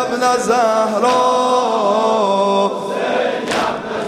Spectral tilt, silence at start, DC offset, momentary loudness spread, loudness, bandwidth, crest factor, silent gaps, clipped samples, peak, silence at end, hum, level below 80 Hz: -3.5 dB/octave; 0 s; under 0.1%; 5 LU; -16 LUFS; 15.5 kHz; 14 dB; none; under 0.1%; -2 dBFS; 0 s; none; -56 dBFS